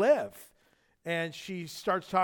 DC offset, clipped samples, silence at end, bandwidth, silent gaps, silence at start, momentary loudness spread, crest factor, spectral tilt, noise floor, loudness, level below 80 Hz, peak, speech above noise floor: under 0.1%; under 0.1%; 0 s; 19 kHz; none; 0 s; 15 LU; 18 dB; -5 dB/octave; -69 dBFS; -32 LUFS; -72 dBFS; -14 dBFS; 39 dB